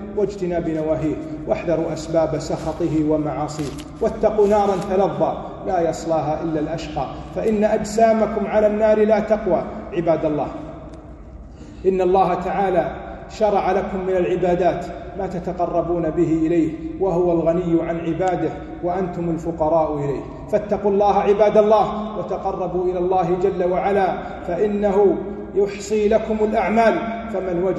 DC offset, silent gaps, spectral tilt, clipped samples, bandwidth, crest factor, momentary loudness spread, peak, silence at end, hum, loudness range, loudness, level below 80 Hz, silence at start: under 0.1%; none; -7 dB/octave; under 0.1%; 12 kHz; 16 dB; 10 LU; -2 dBFS; 0 s; none; 3 LU; -20 LUFS; -42 dBFS; 0 s